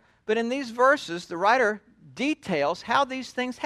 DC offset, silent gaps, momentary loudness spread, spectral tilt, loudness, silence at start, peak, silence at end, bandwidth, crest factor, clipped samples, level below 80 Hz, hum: under 0.1%; none; 9 LU; -4 dB/octave; -25 LUFS; 0.3 s; -8 dBFS; 0 s; 13 kHz; 18 dB; under 0.1%; -66 dBFS; none